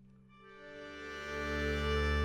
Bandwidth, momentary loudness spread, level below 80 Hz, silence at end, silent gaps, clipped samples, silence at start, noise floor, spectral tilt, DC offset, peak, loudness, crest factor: 13.5 kHz; 19 LU; -42 dBFS; 0 s; none; under 0.1%; 0 s; -59 dBFS; -5.5 dB/octave; under 0.1%; -22 dBFS; -37 LUFS; 16 dB